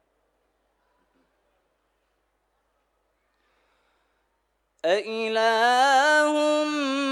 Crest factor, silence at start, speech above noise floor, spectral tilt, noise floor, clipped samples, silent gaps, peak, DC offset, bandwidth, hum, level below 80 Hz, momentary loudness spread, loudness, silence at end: 18 dB; 4.85 s; 53 dB; -1.5 dB/octave; -73 dBFS; under 0.1%; none; -8 dBFS; under 0.1%; 13 kHz; 50 Hz at -80 dBFS; -78 dBFS; 7 LU; -22 LUFS; 0 s